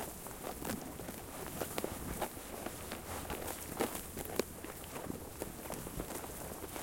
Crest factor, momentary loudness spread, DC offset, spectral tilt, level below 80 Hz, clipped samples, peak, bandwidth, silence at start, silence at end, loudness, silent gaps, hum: 30 dB; 6 LU; under 0.1%; -4 dB/octave; -56 dBFS; under 0.1%; -12 dBFS; 17 kHz; 0 s; 0 s; -42 LUFS; none; none